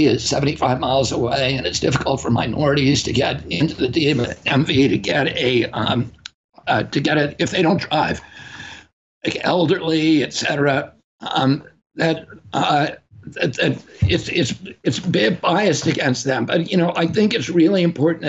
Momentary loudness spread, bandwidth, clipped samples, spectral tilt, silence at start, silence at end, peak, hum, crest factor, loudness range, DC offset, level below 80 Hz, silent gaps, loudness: 9 LU; 8.2 kHz; under 0.1%; -5 dB/octave; 0 s; 0 s; -6 dBFS; none; 14 dB; 3 LU; under 0.1%; -46 dBFS; 6.34-6.49 s, 8.93-9.21 s, 11.04-11.19 s, 11.86-11.90 s; -19 LUFS